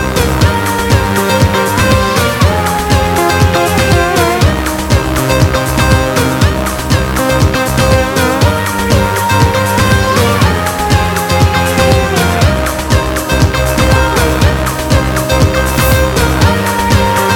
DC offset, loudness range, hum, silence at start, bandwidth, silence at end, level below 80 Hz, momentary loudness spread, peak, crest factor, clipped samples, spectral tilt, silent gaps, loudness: under 0.1%; 1 LU; none; 0 s; 19 kHz; 0 s; -20 dBFS; 3 LU; 0 dBFS; 10 dB; under 0.1%; -5 dB/octave; none; -11 LUFS